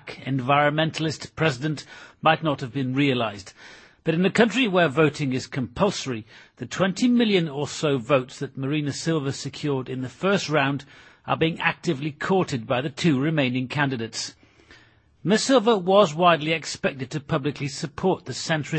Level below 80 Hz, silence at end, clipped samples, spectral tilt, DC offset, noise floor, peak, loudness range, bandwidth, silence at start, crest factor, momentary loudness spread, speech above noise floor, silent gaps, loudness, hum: -60 dBFS; 0 s; under 0.1%; -5.5 dB/octave; under 0.1%; -55 dBFS; -4 dBFS; 3 LU; 8.8 kHz; 0.05 s; 20 dB; 12 LU; 32 dB; none; -23 LUFS; none